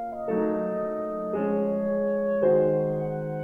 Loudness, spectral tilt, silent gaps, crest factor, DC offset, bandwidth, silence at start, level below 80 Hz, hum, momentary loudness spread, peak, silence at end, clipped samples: -26 LUFS; -10.5 dB/octave; none; 14 dB; under 0.1%; 3.4 kHz; 0 s; -60 dBFS; none; 8 LU; -12 dBFS; 0 s; under 0.1%